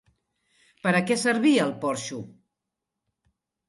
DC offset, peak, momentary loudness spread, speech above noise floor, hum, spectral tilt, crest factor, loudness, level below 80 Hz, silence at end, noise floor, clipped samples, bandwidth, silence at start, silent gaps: under 0.1%; -8 dBFS; 13 LU; 61 dB; none; -4.5 dB/octave; 20 dB; -24 LUFS; -72 dBFS; 1.4 s; -85 dBFS; under 0.1%; 11.5 kHz; 0.85 s; none